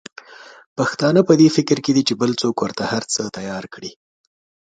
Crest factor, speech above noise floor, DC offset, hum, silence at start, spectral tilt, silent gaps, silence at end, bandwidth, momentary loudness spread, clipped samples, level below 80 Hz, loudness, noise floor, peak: 18 dB; 23 dB; under 0.1%; none; 0.3 s; -5 dB/octave; 0.66-0.76 s; 0.8 s; 9.4 kHz; 20 LU; under 0.1%; -60 dBFS; -18 LUFS; -41 dBFS; 0 dBFS